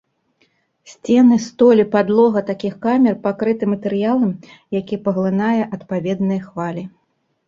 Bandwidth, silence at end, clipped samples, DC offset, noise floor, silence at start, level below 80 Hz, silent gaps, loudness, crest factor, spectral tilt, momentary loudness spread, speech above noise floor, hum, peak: 7.4 kHz; 0.6 s; under 0.1%; under 0.1%; -62 dBFS; 0.9 s; -60 dBFS; none; -17 LUFS; 16 dB; -7.5 dB/octave; 13 LU; 46 dB; none; -2 dBFS